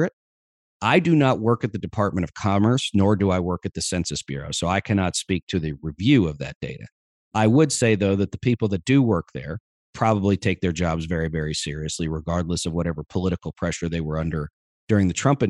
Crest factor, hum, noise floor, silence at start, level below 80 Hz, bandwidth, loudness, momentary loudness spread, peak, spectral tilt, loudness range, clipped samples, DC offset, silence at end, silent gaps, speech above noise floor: 18 dB; none; under -90 dBFS; 0 s; -44 dBFS; 12 kHz; -23 LUFS; 9 LU; -4 dBFS; -5.5 dB/octave; 5 LU; under 0.1%; under 0.1%; 0 s; 0.13-0.80 s, 5.43-5.47 s, 6.55-6.61 s, 6.92-7.31 s, 9.60-9.93 s, 14.53-14.87 s; over 68 dB